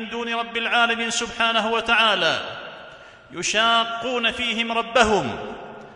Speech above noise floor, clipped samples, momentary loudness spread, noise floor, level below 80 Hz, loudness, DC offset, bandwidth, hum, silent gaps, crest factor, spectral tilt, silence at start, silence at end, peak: 22 dB; under 0.1%; 17 LU; -44 dBFS; -52 dBFS; -20 LUFS; under 0.1%; 11 kHz; none; none; 20 dB; -2 dB/octave; 0 s; 0 s; -4 dBFS